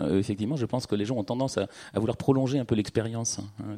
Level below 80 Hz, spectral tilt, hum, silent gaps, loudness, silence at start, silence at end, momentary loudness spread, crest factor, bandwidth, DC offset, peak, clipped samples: -58 dBFS; -6 dB/octave; none; none; -28 LUFS; 0 s; 0 s; 6 LU; 20 dB; 15 kHz; under 0.1%; -8 dBFS; under 0.1%